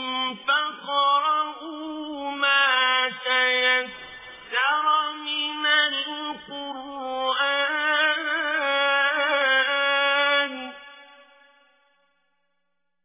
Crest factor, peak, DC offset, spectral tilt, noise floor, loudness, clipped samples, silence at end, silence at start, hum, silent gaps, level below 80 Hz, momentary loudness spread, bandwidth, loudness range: 16 dB; -8 dBFS; under 0.1%; 3.5 dB/octave; -80 dBFS; -22 LUFS; under 0.1%; 2 s; 0 s; none; none; -72 dBFS; 15 LU; 3.9 kHz; 3 LU